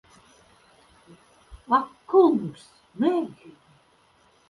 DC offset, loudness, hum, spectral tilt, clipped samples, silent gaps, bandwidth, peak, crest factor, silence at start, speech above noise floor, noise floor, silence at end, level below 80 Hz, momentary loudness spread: under 0.1%; -23 LUFS; none; -7.5 dB/octave; under 0.1%; none; 11.5 kHz; -8 dBFS; 20 dB; 1.5 s; 38 dB; -61 dBFS; 1.15 s; -60 dBFS; 18 LU